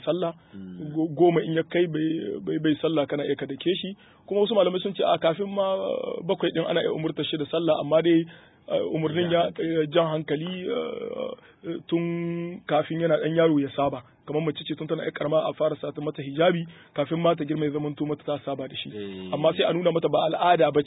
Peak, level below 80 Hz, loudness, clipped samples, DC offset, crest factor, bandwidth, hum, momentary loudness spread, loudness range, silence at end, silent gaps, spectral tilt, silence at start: -8 dBFS; -66 dBFS; -26 LUFS; under 0.1%; under 0.1%; 18 dB; 4 kHz; none; 11 LU; 2 LU; 0 s; none; -11 dB/octave; 0 s